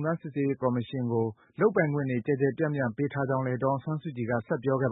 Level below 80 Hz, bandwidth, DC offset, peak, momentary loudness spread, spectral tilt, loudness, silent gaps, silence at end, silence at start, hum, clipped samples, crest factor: -68 dBFS; 4 kHz; under 0.1%; -12 dBFS; 5 LU; -12 dB/octave; -29 LUFS; none; 0 s; 0 s; none; under 0.1%; 18 dB